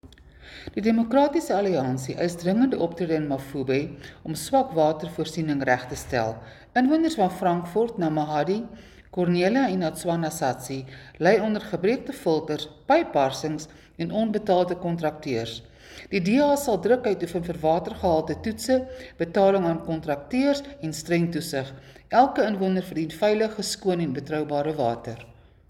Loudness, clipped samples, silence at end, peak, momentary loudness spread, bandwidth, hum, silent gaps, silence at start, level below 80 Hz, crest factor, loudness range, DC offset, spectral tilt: -25 LUFS; under 0.1%; 0.4 s; -6 dBFS; 12 LU; 17 kHz; none; none; 0.05 s; -54 dBFS; 18 dB; 2 LU; under 0.1%; -6 dB/octave